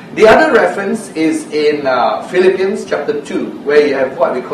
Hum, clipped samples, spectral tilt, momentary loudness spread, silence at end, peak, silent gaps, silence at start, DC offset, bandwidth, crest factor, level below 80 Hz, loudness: none; 0.3%; -5 dB/octave; 10 LU; 0 s; 0 dBFS; none; 0 s; under 0.1%; 12.5 kHz; 12 dB; -48 dBFS; -13 LUFS